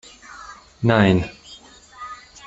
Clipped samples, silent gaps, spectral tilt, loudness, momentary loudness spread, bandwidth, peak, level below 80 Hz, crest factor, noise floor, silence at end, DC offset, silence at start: under 0.1%; none; -7 dB/octave; -18 LUFS; 25 LU; 8 kHz; -2 dBFS; -48 dBFS; 20 dB; -45 dBFS; 0.3 s; under 0.1%; 0.3 s